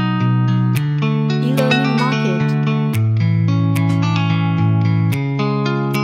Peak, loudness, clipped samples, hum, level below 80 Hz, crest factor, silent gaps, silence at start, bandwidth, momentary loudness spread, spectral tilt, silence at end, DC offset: -2 dBFS; -16 LUFS; under 0.1%; none; -58 dBFS; 14 dB; none; 0 s; 15 kHz; 3 LU; -7.5 dB/octave; 0 s; under 0.1%